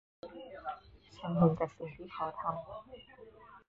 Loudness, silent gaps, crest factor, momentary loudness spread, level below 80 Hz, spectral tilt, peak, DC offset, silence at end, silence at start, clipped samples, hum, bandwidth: -36 LUFS; none; 22 dB; 24 LU; -64 dBFS; -8 dB/octave; -14 dBFS; under 0.1%; 0.1 s; 0.25 s; under 0.1%; none; 7 kHz